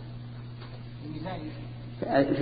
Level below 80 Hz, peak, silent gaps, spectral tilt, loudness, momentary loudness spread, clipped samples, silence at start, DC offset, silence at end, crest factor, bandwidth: -52 dBFS; -12 dBFS; none; -6 dB/octave; -34 LUFS; 16 LU; under 0.1%; 0 s; under 0.1%; 0 s; 20 dB; 4.9 kHz